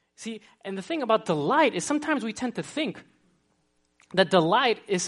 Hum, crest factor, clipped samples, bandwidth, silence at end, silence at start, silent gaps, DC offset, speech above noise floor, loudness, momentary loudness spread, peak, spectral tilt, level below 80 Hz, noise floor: none; 22 dB; under 0.1%; 11.5 kHz; 0 s; 0.2 s; none; under 0.1%; 45 dB; -25 LUFS; 16 LU; -6 dBFS; -4 dB/octave; -72 dBFS; -70 dBFS